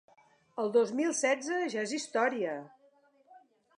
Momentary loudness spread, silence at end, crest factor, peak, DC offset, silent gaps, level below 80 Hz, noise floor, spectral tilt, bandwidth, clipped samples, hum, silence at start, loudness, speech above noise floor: 8 LU; 0.4 s; 18 dB; -14 dBFS; under 0.1%; none; -90 dBFS; -66 dBFS; -3 dB/octave; 11 kHz; under 0.1%; none; 0.55 s; -31 LUFS; 35 dB